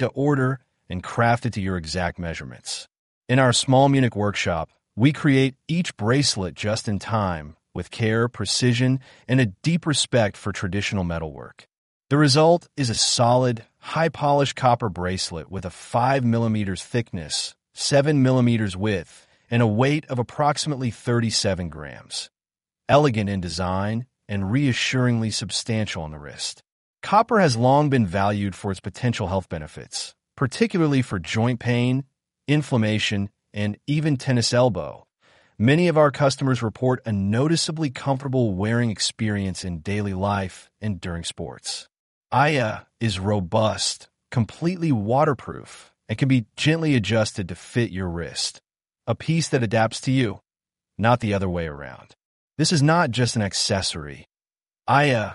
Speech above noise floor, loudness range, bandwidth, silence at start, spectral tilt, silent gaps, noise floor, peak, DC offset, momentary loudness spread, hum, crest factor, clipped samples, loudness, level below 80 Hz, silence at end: over 68 dB; 4 LU; 11.5 kHz; 0 s; -5 dB/octave; 2.99-3.22 s, 11.78-12.00 s, 26.72-26.94 s, 41.99-42.21 s, 52.25-52.48 s; under -90 dBFS; -4 dBFS; under 0.1%; 13 LU; none; 18 dB; under 0.1%; -22 LUFS; -50 dBFS; 0 s